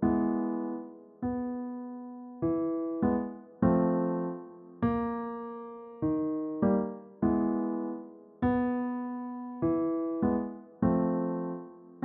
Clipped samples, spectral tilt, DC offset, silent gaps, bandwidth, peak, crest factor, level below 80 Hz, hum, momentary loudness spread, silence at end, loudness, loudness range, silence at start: under 0.1%; -10 dB/octave; under 0.1%; none; 3.9 kHz; -12 dBFS; 18 dB; -56 dBFS; none; 14 LU; 0 s; -31 LUFS; 2 LU; 0 s